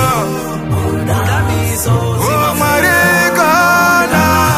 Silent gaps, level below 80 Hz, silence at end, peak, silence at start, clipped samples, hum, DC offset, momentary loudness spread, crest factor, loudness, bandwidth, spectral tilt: none; -32 dBFS; 0 s; 0 dBFS; 0 s; under 0.1%; none; under 0.1%; 7 LU; 12 dB; -12 LUFS; 15.5 kHz; -4.5 dB/octave